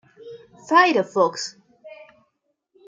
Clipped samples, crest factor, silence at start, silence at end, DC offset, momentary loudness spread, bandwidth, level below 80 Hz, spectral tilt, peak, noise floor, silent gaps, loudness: under 0.1%; 20 dB; 0.25 s; 0.95 s; under 0.1%; 25 LU; 9.2 kHz; -78 dBFS; -3.5 dB/octave; -2 dBFS; -73 dBFS; none; -19 LUFS